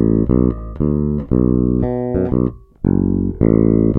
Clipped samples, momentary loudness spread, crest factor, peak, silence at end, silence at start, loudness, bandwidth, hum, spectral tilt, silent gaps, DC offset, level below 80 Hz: under 0.1%; 6 LU; 16 dB; 0 dBFS; 0 s; 0 s; -17 LUFS; 2.5 kHz; none; -14 dB/octave; none; under 0.1%; -26 dBFS